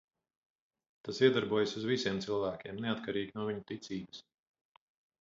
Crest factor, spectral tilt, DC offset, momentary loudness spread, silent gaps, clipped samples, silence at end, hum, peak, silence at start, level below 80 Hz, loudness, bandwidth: 22 dB; -4 dB/octave; under 0.1%; 14 LU; none; under 0.1%; 1 s; none; -14 dBFS; 1.05 s; -70 dBFS; -34 LUFS; 7.6 kHz